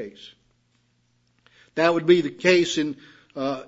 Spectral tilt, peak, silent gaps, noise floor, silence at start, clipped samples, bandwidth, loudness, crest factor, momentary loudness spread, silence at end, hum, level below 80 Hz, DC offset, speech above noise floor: -4.5 dB/octave; -4 dBFS; none; -67 dBFS; 0 s; under 0.1%; 8 kHz; -21 LUFS; 22 dB; 20 LU; 0.05 s; 60 Hz at -50 dBFS; -70 dBFS; under 0.1%; 45 dB